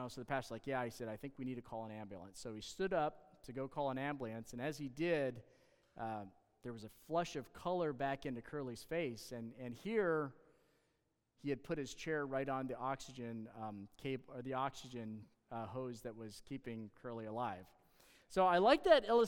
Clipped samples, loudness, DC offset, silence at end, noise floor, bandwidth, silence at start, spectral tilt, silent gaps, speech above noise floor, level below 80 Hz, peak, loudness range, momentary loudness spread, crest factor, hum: under 0.1%; -41 LUFS; under 0.1%; 0 s; -83 dBFS; 18 kHz; 0 s; -5.5 dB/octave; none; 42 dB; -68 dBFS; -18 dBFS; 5 LU; 13 LU; 24 dB; none